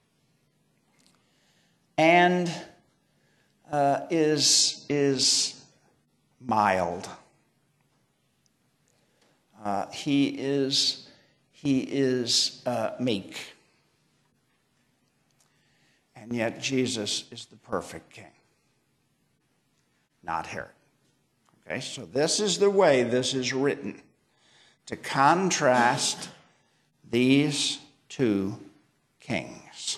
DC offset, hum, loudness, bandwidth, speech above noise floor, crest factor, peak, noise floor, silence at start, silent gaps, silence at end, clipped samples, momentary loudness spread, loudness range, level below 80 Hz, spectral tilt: under 0.1%; none; -25 LUFS; 13 kHz; 46 dB; 22 dB; -6 dBFS; -71 dBFS; 2 s; none; 0 s; under 0.1%; 19 LU; 14 LU; -70 dBFS; -3 dB/octave